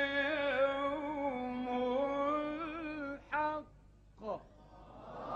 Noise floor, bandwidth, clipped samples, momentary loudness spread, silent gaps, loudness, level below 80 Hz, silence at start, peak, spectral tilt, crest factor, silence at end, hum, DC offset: -60 dBFS; 7.4 kHz; under 0.1%; 14 LU; none; -36 LUFS; -62 dBFS; 0 s; -20 dBFS; -6 dB/octave; 16 dB; 0 s; 50 Hz at -60 dBFS; under 0.1%